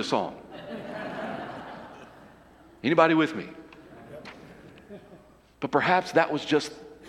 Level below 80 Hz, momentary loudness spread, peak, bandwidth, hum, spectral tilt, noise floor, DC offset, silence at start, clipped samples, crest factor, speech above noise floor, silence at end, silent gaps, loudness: -64 dBFS; 26 LU; -4 dBFS; 12.5 kHz; none; -5.5 dB/octave; -54 dBFS; under 0.1%; 0 s; under 0.1%; 24 dB; 29 dB; 0 s; none; -26 LUFS